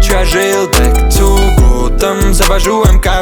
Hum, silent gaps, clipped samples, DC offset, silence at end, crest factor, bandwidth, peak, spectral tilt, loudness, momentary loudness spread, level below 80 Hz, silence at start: none; none; under 0.1%; under 0.1%; 0 s; 8 dB; over 20 kHz; 0 dBFS; -4.5 dB/octave; -10 LUFS; 2 LU; -10 dBFS; 0 s